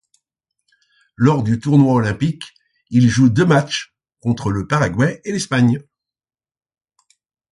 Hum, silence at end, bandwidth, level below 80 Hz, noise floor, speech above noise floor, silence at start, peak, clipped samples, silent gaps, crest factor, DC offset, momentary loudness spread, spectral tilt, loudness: none; 1.7 s; 11.5 kHz; -46 dBFS; under -90 dBFS; over 74 dB; 1.2 s; -2 dBFS; under 0.1%; none; 16 dB; under 0.1%; 12 LU; -6.5 dB/octave; -17 LUFS